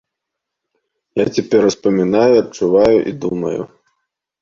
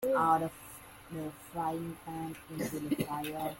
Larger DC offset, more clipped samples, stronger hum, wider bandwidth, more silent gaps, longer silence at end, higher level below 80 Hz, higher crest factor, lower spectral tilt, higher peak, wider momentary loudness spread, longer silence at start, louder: neither; neither; neither; second, 7.6 kHz vs 17 kHz; neither; first, 0.75 s vs 0 s; first, -50 dBFS vs -64 dBFS; about the same, 16 dB vs 20 dB; about the same, -6 dB/octave vs -5.5 dB/octave; first, 0 dBFS vs -16 dBFS; second, 11 LU vs 16 LU; first, 1.15 s vs 0 s; first, -15 LUFS vs -35 LUFS